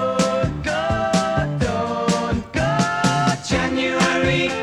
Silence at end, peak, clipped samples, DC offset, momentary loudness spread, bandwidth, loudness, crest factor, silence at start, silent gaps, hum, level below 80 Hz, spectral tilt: 0 s; -2 dBFS; under 0.1%; under 0.1%; 4 LU; 13 kHz; -20 LUFS; 18 dB; 0 s; none; none; -38 dBFS; -5 dB/octave